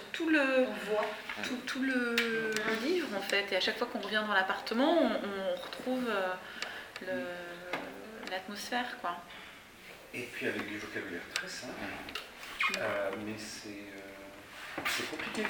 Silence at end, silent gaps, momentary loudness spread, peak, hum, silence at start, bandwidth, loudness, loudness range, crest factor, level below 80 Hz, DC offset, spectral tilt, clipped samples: 0 s; none; 15 LU; -12 dBFS; none; 0 s; over 20 kHz; -34 LUFS; 8 LU; 22 dB; -68 dBFS; under 0.1%; -3 dB/octave; under 0.1%